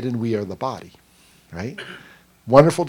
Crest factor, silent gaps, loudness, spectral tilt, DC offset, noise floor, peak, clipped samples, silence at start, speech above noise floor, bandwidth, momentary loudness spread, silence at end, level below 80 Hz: 20 dB; none; -21 LUFS; -7 dB/octave; under 0.1%; -51 dBFS; 0 dBFS; under 0.1%; 0 s; 31 dB; 16 kHz; 25 LU; 0 s; -50 dBFS